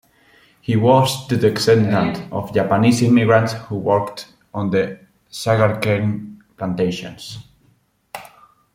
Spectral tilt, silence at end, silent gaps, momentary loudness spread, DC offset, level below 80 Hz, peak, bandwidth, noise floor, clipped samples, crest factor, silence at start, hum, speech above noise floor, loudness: -6 dB/octave; 0.5 s; none; 21 LU; under 0.1%; -54 dBFS; -2 dBFS; 16 kHz; -59 dBFS; under 0.1%; 18 dB; 0.7 s; none; 42 dB; -18 LUFS